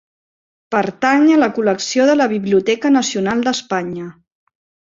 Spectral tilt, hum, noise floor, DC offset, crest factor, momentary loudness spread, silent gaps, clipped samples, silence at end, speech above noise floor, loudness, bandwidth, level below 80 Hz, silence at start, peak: -4.5 dB/octave; none; under -90 dBFS; under 0.1%; 16 dB; 9 LU; none; under 0.1%; 0.75 s; over 75 dB; -16 LUFS; 7.8 kHz; -60 dBFS; 0.7 s; -2 dBFS